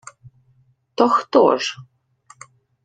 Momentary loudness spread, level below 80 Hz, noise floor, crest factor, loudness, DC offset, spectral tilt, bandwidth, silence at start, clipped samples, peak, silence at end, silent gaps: 20 LU; -64 dBFS; -59 dBFS; 20 dB; -17 LUFS; under 0.1%; -4 dB/octave; 9.4 kHz; 1 s; under 0.1%; -2 dBFS; 1 s; none